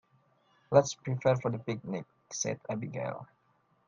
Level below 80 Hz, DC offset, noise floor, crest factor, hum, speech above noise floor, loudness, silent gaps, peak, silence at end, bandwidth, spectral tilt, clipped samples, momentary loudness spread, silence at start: -70 dBFS; under 0.1%; -71 dBFS; 24 dB; none; 40 dB; -32 LUFS; none; -8 dBFS; 0.65 s; 10 kHz; -5.5 dB/octave; under 0.1%; 13 LU; 0.7 s